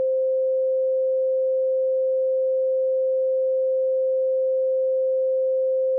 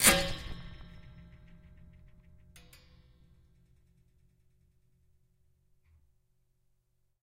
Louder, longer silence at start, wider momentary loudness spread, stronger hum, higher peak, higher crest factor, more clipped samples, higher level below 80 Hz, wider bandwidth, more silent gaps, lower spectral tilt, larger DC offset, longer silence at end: first, -22 LUFS vs -30 LUFS; about the same, 0 s vs 0 s; second, 0 LU vs 28 LU; neither; second, -18 dBFS vs -6 dBFS; second, 4 dB vs 32 dB; neither; second, under -90 dBFS vs -52 dBFS; second, 0.6 kHz vs 16 kHz; neither; second, 7.5 dB/octave vs -1.5 dB/octave; neither; second, 0 s vs 6 s